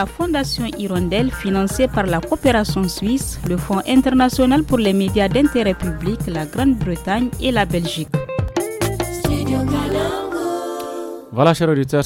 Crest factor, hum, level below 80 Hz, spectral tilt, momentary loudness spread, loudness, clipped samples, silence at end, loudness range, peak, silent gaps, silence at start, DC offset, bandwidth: 16 dB; none; -34 dBFS; -5.5 dB/octave; 8 LU; -19 LUFS; under 0.1%; 0 s; 4 LU; -2 dBFS; none; 0 s; under 0.1%; 17 kHz